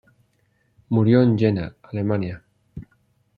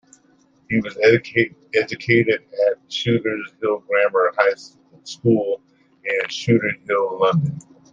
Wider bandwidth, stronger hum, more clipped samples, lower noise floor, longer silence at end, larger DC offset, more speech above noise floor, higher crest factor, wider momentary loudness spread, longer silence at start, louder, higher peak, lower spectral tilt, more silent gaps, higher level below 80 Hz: second, 5 kHz vs 7.8 kHz; neither; neither; first, -65 dBFS vs -57 dBFS; first, 0.55 s vs 0.35 s; neither; first, 47 dB vs 38 dB; about the same, 18 dB vs 20 dB; first, 25 LU vs 9 LU; first, 0.9 s vs 0.7 s; about the same, -21 LUFS vs -20 LUFS; about the same, -4 dBFS vs -2 dBFS; first, -10.5 dB/octave vs -6 dB/octave; neither; first, -54 dBFS vs -62 dBFS